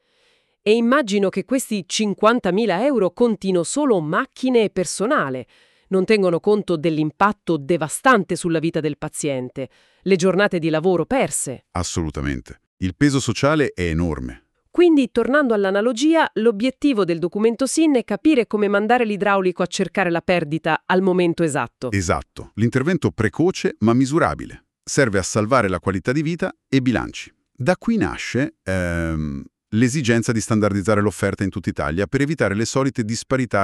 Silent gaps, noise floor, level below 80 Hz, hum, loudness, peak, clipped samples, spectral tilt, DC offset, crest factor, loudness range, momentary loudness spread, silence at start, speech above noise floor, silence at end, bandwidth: 12.67-12.77 s; -62 dBFS; -44 dBFS; none; -20 LUFS; -2 dBFS; under 0.1%; -5.5 dB/octave; under 0.1%; 16 dB; 3 LU; 8 LU; 0.65 s; 43 dB; 0 s; 13.5 kHz